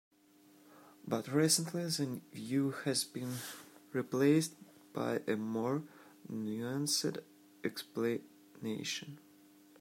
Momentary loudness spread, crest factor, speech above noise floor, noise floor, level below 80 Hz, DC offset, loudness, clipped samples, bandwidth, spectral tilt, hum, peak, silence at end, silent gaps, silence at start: 17 LU; 22 dB; 29 dB; -64 dBFS; -82 dBFS; under 0.1%; -36 LUFS; under 0.1%; 16 kHz; -4 dB/octave; none; -16 dBFS; 0.65 s; none; 0.75 s